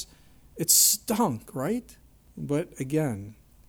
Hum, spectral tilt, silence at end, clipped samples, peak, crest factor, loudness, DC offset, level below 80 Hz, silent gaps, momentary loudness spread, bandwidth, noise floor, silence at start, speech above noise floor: none; -3 dB/octave; 0.35 s; under 0.1%; -6 dBFS; 22 dB; -24 LUFS; under 0.1%; -58 dBFS; none; 18 LU; over 20 kHz; -54 dBFS; 0 s; 28 dB